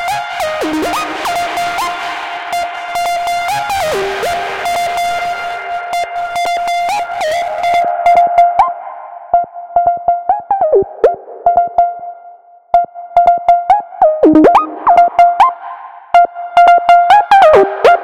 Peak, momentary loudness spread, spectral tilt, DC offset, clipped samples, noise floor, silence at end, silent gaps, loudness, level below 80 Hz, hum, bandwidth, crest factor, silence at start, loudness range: 0 dBFS; 11 LU; -3.5 dB/octave; under 0.1%; under 0.1%; -38 dBFS; 0 s; none; -12 LUFS; -46 dBFS; none; 16.5 kHz; 12 dB; 0 s; 8 LU